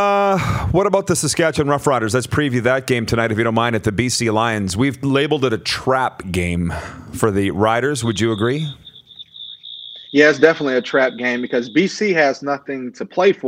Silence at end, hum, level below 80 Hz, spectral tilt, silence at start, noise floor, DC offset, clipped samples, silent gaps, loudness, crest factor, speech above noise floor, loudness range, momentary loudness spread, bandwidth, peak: 0 s; none; -44 dBFS; -5 dB/octave; 0 s; -40 dBFS; under 0.1%; under 0.1%; none; -18 LUFS; 18 dB; 23 dB; 3 LU; 12 LU; 16 kHz; 0 dBFS